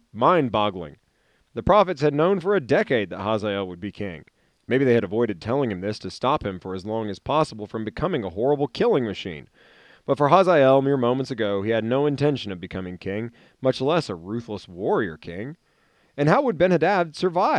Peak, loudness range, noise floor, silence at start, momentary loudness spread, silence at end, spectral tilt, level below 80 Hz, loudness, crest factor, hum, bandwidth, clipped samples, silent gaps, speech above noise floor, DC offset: -2 dBFS; 5 LU; -65 dBFS; 0.15 s; 14 LU; 0 s; -7 dB/octave; -54 dBFS; -23 LUFS; 22 dB; none; 10 kHz; under 0.1%; none; 43 dB; under 0.1%